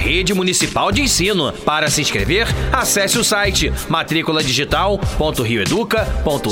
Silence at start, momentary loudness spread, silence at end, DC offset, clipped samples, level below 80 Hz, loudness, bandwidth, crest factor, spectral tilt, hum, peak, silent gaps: 0 s; 4 LU; 0 s; under 0.1%; under 0.1%; -28 dBFS; -16 LUFS; 17 kHz; 16 dB; -3.5 dB/octave; none; -2 dBFS; none